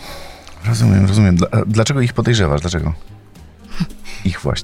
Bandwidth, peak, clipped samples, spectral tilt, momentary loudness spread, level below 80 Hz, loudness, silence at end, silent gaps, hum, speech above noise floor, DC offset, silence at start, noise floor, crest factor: 13.5 kHz; -2 dBFS; under 0.1%; -6 dB/octave; 18 LU; -32 dBFS; -16 LUFS; 0 s; none; none; 26 dB; under 0.1%; 0 s; -40 dBFS; 14 dB